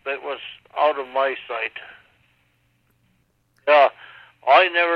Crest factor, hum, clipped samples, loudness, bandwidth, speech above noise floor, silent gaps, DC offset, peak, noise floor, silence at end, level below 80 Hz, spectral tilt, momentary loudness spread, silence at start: 18 dB; none; under 0.1%; -20 LUFS; 6 kHz; 41 dB; none; under 0.1%; -4 dBFS; -65 dBFS; 0 s; -72 dBFS; -3.5 dB/octave; 16 LU; 0.05 s